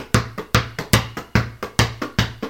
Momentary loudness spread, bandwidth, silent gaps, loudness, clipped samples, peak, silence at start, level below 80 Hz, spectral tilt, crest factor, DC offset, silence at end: 3 LU; 17 kHz; none; -21 LUFS; under 0.1%; 0 dBFS; 0 s; -34 dBFS; -4.5 dB/octave; 22 dB; 0.2%; 0 s